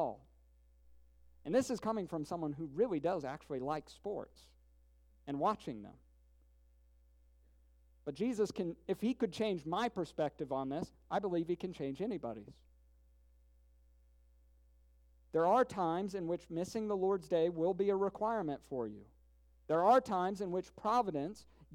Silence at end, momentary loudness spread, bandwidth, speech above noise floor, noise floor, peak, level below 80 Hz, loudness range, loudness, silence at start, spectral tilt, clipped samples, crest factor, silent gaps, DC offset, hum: 0 s; 13 LU; 15.5 kHz; 31 dB; -67 dBFS; -16 dBFS; -66 dBFS; 9 LU; -37 LUFS; 0 s; -6.5 dB/octave; under 0.1%; 22 dB; none; under 0.1%; none